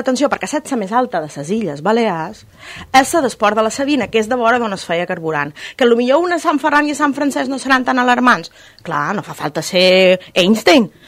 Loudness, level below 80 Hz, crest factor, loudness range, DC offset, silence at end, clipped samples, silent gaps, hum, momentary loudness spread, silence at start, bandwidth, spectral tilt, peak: -15 LUFS; -54 dBFS; 16 dB; 3 LU; under 0.1%; 0.2 s; under 0.1%; none; none; 10 LU; 0 s; 16 kHz; -4 dB/octave; 0 dBFS